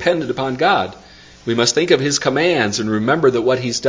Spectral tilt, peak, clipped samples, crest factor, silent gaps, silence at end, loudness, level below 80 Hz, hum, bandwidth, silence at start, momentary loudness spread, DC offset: -4 dB/octave; 0 dBFS; under 0.1%; 16 dB; none; 0 s; -16 LUFS; -50 dBFS; none; 7.8 kHz; 0 s; 7 LU; under 0.1%